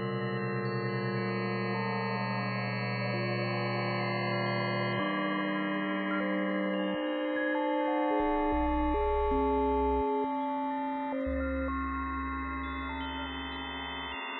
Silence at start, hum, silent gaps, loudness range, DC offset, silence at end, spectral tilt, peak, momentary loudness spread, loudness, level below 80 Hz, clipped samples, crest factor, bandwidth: 0 s; none; none; 4 LU; under 0.1%; 0 s; -9.5 dB/octave; -18 dBFS; 7 LU; -32 LUFS; -44 dBFS; under 0.1%; 14 dB; 4.7 kHz